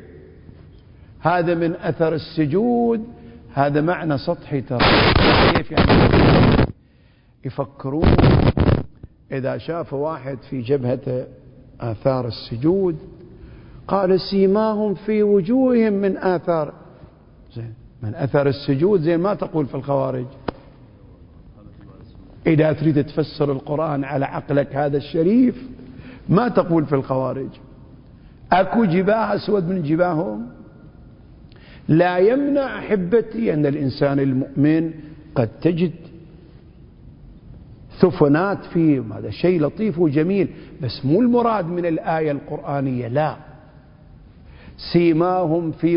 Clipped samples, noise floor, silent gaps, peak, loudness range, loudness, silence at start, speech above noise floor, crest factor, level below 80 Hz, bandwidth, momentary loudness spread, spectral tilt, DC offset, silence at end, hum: under 0.1%; -53 dBFS; none; 0 dBFS; 7 LU; -19 LUFS; 0 s; 34 dB; 20 dB; -36 dBFS; 5.4 kHz; 15 LU; -11.5 dB/octave; under 0.1%; 0 s; none